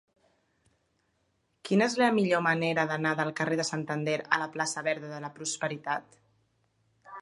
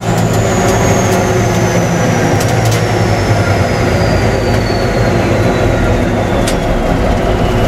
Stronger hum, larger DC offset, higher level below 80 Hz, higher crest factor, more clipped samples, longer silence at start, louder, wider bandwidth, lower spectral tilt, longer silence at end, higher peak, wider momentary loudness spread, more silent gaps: neither; neither; second, -78 dBFS vs -22 dBFS; first, 22 dB vs 10 dB; neither; first, 1.65 s vs 0 s; second, -29 LUFS vs -12 LUFS; second, 11.5 kHz vs 15.5 kHz; about the same, -4.5 dB/octave vs -5.5 dB/octave; about the same, 0 s vs 0 s; second, -8 dBFS vs 0 dBFS; first, 10 LU vs 2 LU; neither